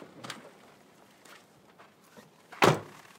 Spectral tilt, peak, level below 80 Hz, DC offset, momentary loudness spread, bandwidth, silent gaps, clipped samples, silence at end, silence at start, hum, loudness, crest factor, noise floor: -4.5 dB/octave; -8 dBFS; -72 dBFS; under 0.1%; 28 LU; 16 kHz; none; under 0.1%; 0.35 s; 0.25 s; none; -26 LUFS; 28 dB; -58 dBFS